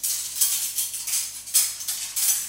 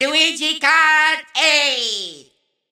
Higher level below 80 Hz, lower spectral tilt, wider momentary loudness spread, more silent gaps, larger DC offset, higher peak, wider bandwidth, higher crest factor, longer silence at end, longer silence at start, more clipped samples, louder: first, -66 dBFS vs -74 dBFS; second, 3.5 dB/octave vs 1.5 dB/octave; second, 5 LU vs 10 LU; neither; neither; about the same, -4 dBFS vs -2 dBFS; about the same, 17 kHz vs 17 kHz; first, 22 dB vs 16 dB; second, 0 s vs 0.55 s; about the same, 0 s vs 0 s; neither; second, -23 LUFS vs -15 LUFS